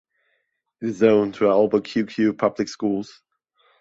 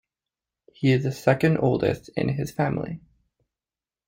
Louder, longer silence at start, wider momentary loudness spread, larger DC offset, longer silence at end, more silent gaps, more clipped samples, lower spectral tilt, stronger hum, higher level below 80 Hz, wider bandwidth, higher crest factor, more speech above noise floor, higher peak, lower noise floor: first, -21 LUFS vs -24 LUFS; about the same, 0.8 s vs 0.8 s; first, 12 LU vs 9 LU; neither; second, 0.75 s vs 1.1 s; neither; neither; about the same, -6.5 dB/octave vs -7.5 dB/octave; neither; second, -64 dBFS vs -54 dBFS; second, 7.8 kHz vs 16.5 kHz; about the same, 20 dB vs 20 dB; second, 52 dB vs over 67 dB; first, -2 dBFS vs -6 dBFS; second, -73 dBFS vs under -90 dBFS